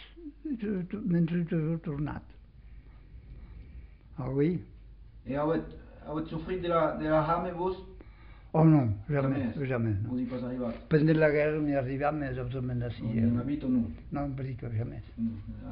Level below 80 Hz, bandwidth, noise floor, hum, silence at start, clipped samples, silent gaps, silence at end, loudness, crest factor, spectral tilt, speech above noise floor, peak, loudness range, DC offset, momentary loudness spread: -50 dBFS; 5.2 kHz; -50 dBFS; none; 0 s; under 0.1%; none; 0 s; -30 LUFS; 18 dB; -8 dB/octave; 21 dB; -12 dBFS; 7 LU; under 0.1%; 17 LU